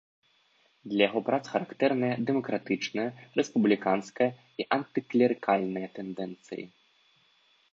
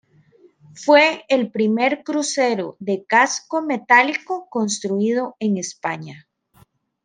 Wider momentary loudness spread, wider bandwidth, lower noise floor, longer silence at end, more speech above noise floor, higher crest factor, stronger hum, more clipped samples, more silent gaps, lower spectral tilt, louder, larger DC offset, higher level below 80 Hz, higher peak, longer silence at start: about the same, 13 LU vs 12 LU; second, 7.6 kHz vs 10 kHz; first, -67 dBFS vs -56 dBFS; first, 1.05 s vs 0.85 s; about the same, 39 dB vs 37 dB; about the same, 22 dB vs 18 dB; neither; neither; neither; first, -6 dB/octave vs -3.5 dB/octave; second, -29 LUFS vs -19 LUFS; neither; about the same, -76 dBFS vs -74 dBFS; second, -8 dBFS vs -2 dBFS; about the same, 0.85 s vs 0.75 s